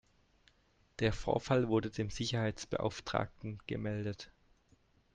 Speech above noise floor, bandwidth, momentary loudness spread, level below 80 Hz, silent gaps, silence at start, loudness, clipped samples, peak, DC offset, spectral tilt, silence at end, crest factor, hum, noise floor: 35 dB; 9.6 kHz; 12 LU; -56 dBFS; none; 1 s; -36 LUFS; under 0.1%; -16 dBFS; under 0.1%; -6 dB/octave; 0.9 s; 22 dB; none; -71 dBFS